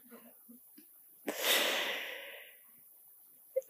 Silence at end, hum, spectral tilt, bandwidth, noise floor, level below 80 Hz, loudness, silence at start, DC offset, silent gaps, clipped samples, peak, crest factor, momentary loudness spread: 0.05 s; none; 0.5 dB/octave; 15.5 kHz; -60 dBFS; under -90 dBFS; -33 LUFS; 0.05 s; under 0.1%; none; under 0.1%; -18 dBFS; 22 dB; 27 LU